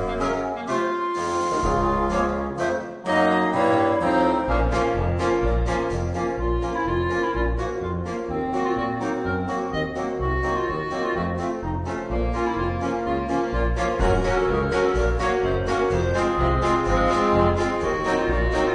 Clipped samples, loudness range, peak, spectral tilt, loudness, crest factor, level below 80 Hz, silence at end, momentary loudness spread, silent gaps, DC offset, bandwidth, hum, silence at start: under 0.1%; 4 LU; -4 dBFS; -6.5 dB/octave; -23 LUFS; 18 dB; -32 dBFS; 0 s; 6 LU; none; under 0.1%; 10 kHz; none; 0 s